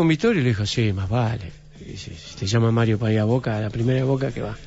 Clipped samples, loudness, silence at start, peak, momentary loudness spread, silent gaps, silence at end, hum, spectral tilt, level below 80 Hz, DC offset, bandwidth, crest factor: under 0.1%; -22 LUFS; 0 s; -8 dBFS; 17 LU; none; 0 s; none; -6.5 dB/octave; -44 dBFS; under 0.1%; 8 kHz; 14 dB